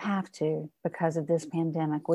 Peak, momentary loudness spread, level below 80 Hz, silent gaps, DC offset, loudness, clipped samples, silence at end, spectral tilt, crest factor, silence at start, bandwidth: -14 dBFS; 4 LU; -76 dBFS; none; under 0.1%; -31 LUFS; under 0.1%; 0 s; -7.5 dB/octave; 16 dB; 0 s; 11.5 kHz